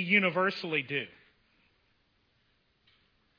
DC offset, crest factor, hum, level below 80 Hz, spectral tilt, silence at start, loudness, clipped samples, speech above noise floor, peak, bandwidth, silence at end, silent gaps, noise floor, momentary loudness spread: under 0.1%; 22 dB; none; -80 dBFS; -6.5 dB/octave; 0 s; -29 LUFS; under 0.1%; 42 dB; -12 dBFS; 5.4 kHz; 2.3 s; none; -72 dBFS; 11 LU